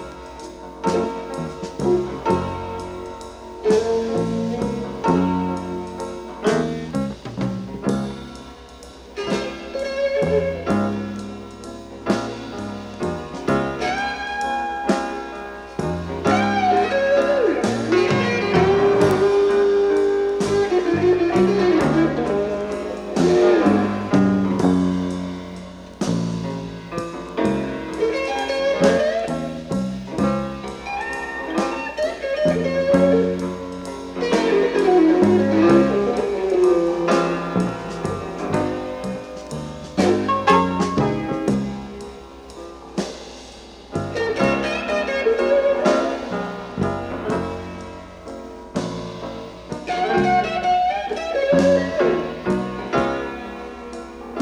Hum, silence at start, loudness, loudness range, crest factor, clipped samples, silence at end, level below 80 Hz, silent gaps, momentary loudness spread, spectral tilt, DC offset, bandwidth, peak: none; 0 s; -21 LUFS; 8 LU; 18 dB; under 0.1%; 0 s; -46 dBFS; none; 16 LU; -6.5 dB/octave; under 0.1%; 12 kHz; -2 dBFS